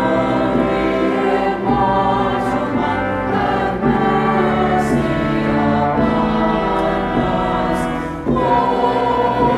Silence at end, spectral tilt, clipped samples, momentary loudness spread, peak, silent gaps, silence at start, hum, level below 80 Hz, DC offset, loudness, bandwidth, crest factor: 0 s; -7 dB/octave; under 0.1%; 3 LU; -4 dBFS; none; 0 s; none; -34 dBFS; under 0.1%; -17 LUFS; 13 kHz; 12 dB